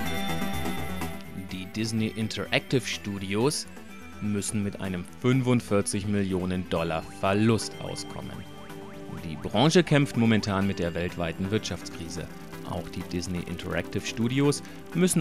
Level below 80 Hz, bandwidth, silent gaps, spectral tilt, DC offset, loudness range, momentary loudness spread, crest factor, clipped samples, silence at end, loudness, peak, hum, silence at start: -52 dBFS; 15.5 kHz; none; -5 dB/octave; 0.5%; 5 LU; 14 LU; 20 dB; under 0.1%; 0 s; -28 LUFS; -6 dBFS; none; 0 s